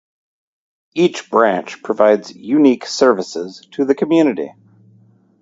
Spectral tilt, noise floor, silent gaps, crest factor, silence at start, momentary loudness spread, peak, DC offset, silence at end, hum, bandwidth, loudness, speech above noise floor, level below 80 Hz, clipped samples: -5 dB/octave; -51 dBFS; none; 16 dB; 0.95 s; 13 LU; 0 dBFS; under 0.1%; 0.9 s; none; 7.8 kHz; -16 LUFS; 36 dB; -66 dBFS; under 0.1%